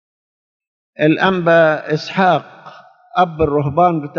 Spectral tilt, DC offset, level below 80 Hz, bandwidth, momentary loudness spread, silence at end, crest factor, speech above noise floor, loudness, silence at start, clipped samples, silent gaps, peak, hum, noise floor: -4.5 dB/octave; under 0.1%; -46 dBFS; 7 kHz; 8 LU; 0 s; 16 dB; 26 dB; -15 LUFS; 1 s; under 0.1%; none; 0 dBFS; none; -41 dBFS